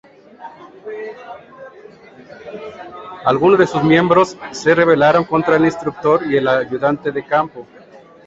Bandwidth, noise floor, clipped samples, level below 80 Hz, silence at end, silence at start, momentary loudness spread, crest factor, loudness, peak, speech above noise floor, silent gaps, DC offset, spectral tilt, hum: 8 kHz; -41 dBFS; under 0.1%; -54 dBFS; 0.65 s; 0.4 s; 23 LU; 16 dB; -15 LUFS; -2 dBFS; 26 dB; none; under 0.1%; -6.5 dB/octave; none